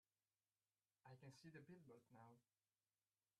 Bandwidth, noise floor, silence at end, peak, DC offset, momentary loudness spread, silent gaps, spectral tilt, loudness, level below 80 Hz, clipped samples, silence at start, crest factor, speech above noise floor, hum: 9.4 kHz; under -90 dBFS; 1 s; -50 dBFS; under 0.1%; 6 LU; none; -6 dB/octave; -66 LUFS; under -90 dBFS; under 0.1%; 1.05 s; 18 dB; over 24 dB; none